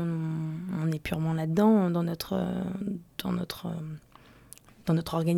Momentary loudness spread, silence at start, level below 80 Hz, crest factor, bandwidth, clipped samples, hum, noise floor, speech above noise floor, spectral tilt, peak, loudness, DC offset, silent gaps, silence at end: 13 LU; 0 s; -56 dBFS; 16 dB; 17 kHz; under 0.1%; none; -53 dBFS; 25 dB; -7.5 dB/octave; -12 dBFS; -29 LUFS; under 0.1%; none; 0 s